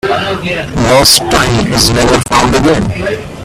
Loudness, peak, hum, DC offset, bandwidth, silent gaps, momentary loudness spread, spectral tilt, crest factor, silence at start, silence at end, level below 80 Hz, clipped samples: -9 LUFS; 0 dBFS; none; under 0.1%; over 20 kHz; none; 10 LU; -3.5 dB/octave; 10 dB; 0.05 s; 0 s; -26 dBFS; 0.3%